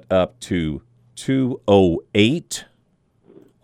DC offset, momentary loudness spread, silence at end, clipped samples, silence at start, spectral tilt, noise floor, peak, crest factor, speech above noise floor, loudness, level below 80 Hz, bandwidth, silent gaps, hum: under 0.1%; 15 LU; 1 s; under 0.1%; 0.1 s; -5.5 dB/octave; -63 dBFS; -2 dBFS; 20 dB; 44 dB; -20 LUFS; -46 dBFS; 15 kHz; none; none